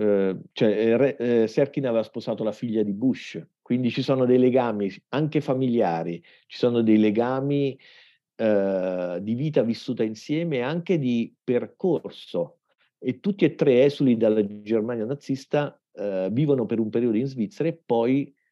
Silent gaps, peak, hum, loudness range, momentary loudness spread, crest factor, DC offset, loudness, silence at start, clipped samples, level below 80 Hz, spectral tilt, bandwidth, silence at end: none; -8 dBFS; none; 3 LU; 10 LU; 16 dB; under 0.1%; -24 LUFS; 0 s; under 0.1%; -82 dBFS; -8 dB/octave; 7.6 kHz; 0.25 s